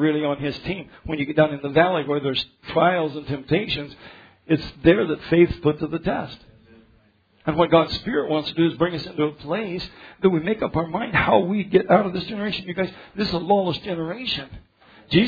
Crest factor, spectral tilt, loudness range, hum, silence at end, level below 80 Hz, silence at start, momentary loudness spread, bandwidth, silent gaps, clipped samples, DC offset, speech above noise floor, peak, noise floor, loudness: 20 dB; -8 dB/octave; 2 LU; none; 0 s; -48 dBFS; 0 s; 10 LU; 5 kHz; none; under 0.1%; under 0.1%; 37 dB; -2 dBFS; -59 dBFS; -22 LUFS